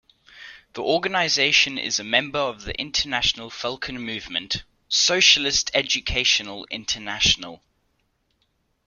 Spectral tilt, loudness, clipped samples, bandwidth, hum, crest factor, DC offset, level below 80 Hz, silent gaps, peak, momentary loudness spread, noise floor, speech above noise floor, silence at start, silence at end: -1 dB/octave; -21 LUFS; under 0.1%; 14 kHz; none; 22 dB; under 0.1%; -46 dBFS; none; -2 dBFS; 14 LU; -70 dBFS; 47 dB; 0.35 s; 1.3 s